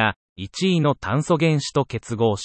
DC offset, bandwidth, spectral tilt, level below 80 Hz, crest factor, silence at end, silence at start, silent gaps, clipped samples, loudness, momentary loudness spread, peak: under 0.1%; 8.8 kHz; -6 dB/octave; -54 dBFS; 18 dB; 0 s; 0 s; 0.16-0.36 s; under 0.1%; -21 LUFS; 8 LU; -4 dBFS